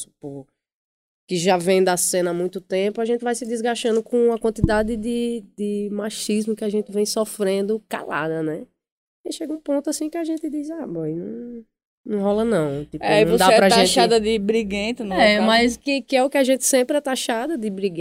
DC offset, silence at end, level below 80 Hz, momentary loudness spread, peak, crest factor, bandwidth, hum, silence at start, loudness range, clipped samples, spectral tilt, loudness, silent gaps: under 0.1%; 0 s; -46 dBFS; 13 LU; -2 dBFS; 20 dB; 16 kHz; none; 0 s; 10 LU; under 0.1%; -4 dB/octave; -20 LUFS; 0.74-1.27 s, 8.92-9.24 s, 11.85-12.04 s